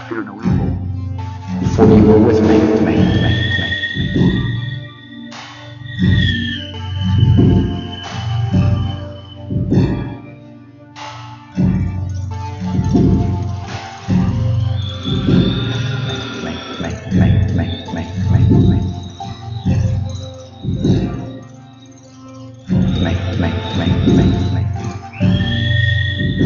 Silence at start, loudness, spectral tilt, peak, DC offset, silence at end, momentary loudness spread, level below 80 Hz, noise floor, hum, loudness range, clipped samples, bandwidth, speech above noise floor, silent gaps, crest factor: 0 s; -16 LUFS; -7.5 dB/octave; 0 dBFS; under 0.1%; 0 s; 17 LU; -30 dBFS; -39 dBFS; none; 8 LU; under 0.1%; 7.2 kHz; 27 dB; none; 16 dB